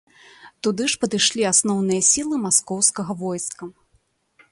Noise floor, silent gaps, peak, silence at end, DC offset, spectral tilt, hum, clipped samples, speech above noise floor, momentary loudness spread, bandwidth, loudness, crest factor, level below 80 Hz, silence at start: -65 dBFS; none; -2 dBFS; 0.8 s; under 0.1%; -2.5 dB/octave; none; under 0.1%; 43 dB; 12 LU; 11.5 kHz; -19 LUFS; 20 dB; -60 dBFS; 0.45 s